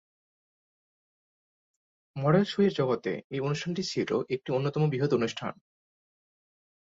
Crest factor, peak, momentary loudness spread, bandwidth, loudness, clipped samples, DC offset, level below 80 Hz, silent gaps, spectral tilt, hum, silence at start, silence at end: 20 dB; -12 dBFS; 8 LU; 7.8 kHz; -29 LUFS; under 0.1%; under 0.1%; -68 dBFS; 3.24-3.30 s; -6.5 dB/octave; none; 2.15 s; 1.4 s